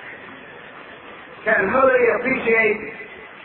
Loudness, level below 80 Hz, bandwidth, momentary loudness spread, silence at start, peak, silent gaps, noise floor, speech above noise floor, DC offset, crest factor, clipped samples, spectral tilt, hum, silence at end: -18 LUFS; -56 dBFS; 4.2 kHz; 23 LU; 0 s; -4 dBFS; none; -40 dBFS; 22 dB; under 0.1%; 16 dB; under 0.1%; -9 dB/octave; none; 0 s